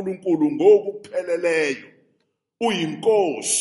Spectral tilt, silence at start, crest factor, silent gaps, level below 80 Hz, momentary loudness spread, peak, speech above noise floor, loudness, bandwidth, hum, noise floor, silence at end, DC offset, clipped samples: -3.5 dB/octave; 0 s; 16 dB; none; -72 dBFS; 11 LU; -4 dBFS; 50 dB; -20 LUFS; 11.5 kHz; none; -70 dBFS; 0 s; under 0.1%; under 0.1%